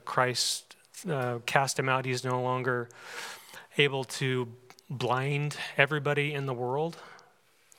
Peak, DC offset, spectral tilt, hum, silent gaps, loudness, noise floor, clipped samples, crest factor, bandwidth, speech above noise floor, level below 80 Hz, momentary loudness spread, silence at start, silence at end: -6 dBFS; under 0.1%; -4 dB/octave; none; none; -29 LUFS; -64 dBFS; under 0.1%; 26 dB; 17 kHz; 34 dB; -80 dBFS; 14 LU; 0.05 s; 0.6 s